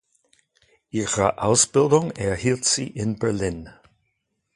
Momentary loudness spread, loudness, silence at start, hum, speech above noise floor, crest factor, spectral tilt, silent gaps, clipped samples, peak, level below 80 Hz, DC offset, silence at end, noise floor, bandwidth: 11 LU; -21 LUFS; 0.95 s; none; 53 dB; 20 dB; -4 dB/octave; none; under 0.1%; -4 dBFS; -48 dBFS; under 0.1%; 0.85 s; -75 dBFS; 11.5 kHz